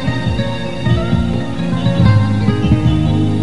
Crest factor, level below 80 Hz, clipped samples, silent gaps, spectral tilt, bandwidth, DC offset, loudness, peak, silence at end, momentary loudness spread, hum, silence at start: 14 dB; -26 dBFS; under 0.1%; none; -8 dB/octave; 11 kHz; 5%; -15 LUFS; 0 dBFS; 0 s; 7 LU; none; 0 s